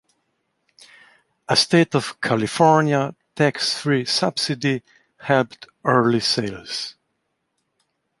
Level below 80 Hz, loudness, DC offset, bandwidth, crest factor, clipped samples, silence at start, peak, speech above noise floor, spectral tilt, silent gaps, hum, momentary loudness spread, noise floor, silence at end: -62 dBFS; -20 LUFS; under 0.1%; 11.5 kHz; 20 dB; under 0.1%; 1.5 s; -2 dBFS; 54 dB; -4.5 dB/octave; none; none; 13 LU; -74 dBFS; 1.3 s